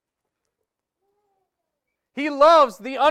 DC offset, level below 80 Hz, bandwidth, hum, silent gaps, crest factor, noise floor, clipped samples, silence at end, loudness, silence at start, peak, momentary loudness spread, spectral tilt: under 0.1%; -64 dBFS; 13.5 kHz; none; none; 18 dB; -82 dBFS; under 0.1%; 0 s; -17 LUFS; 2.15 s; -4 dBFS; 15 LU; -3 dB/octave